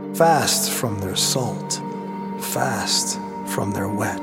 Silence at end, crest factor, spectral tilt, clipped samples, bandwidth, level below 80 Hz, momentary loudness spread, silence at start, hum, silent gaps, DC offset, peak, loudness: 0 s; 20 dB; -3 dB/octave; under 0.1%; 17 kHz; -60 dBFS; 11 LU; 0 s; none; none; under 0.1%; -2 dBFS; -21 LUFS